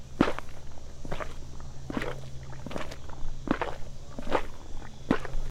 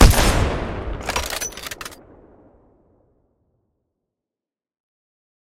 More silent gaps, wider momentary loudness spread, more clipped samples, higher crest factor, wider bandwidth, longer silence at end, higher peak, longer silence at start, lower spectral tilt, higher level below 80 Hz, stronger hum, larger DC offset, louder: neither; about the same, 15 LU vs 17 LU; neither; about the same, 22 dB vs 22 dB; second, 9.4 kHz vs 17.5 kHz; second, 0 s vs 3.5 s; second, -8 dBFS vs 0 dBFS; about the same, 0 s vs 0 s; first, -6 dB/octave vs -4 dB/octave; second, -38 dBFS vs -24 dBFS; neither; neither; second, -35 LUFS vs -22 LUFS